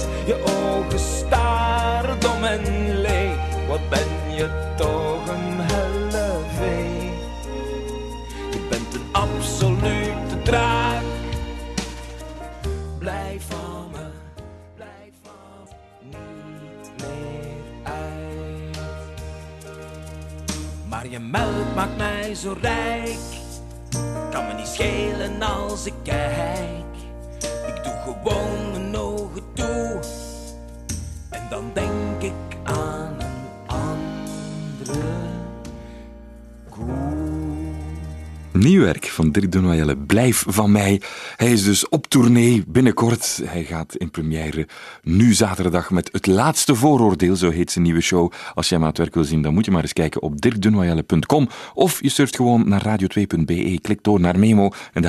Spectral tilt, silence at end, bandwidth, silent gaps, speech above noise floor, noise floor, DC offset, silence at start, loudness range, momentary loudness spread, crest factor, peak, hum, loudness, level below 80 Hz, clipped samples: -5.5 dB/octave; 0 s; 13 kHz; none; 27 dB; -45 dBFS; under 0.1%; 0 s; 15 LU; 18 LU; 20 dB; 0 dBFS; none; -21 LUFS; -34 dBFS; under 0.1%